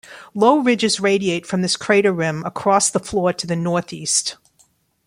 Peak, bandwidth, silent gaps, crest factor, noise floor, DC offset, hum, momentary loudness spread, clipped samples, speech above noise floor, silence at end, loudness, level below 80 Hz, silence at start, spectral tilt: -2 dBFS; 16 kHz; none; 16 dB; -59 dBFS; under 0.1%; none; 7 LU; under 0.1%; 41 dB; 0.75 s; -18 LUFS; -56 dBFS; 0.1 s; -3.5 dB/octave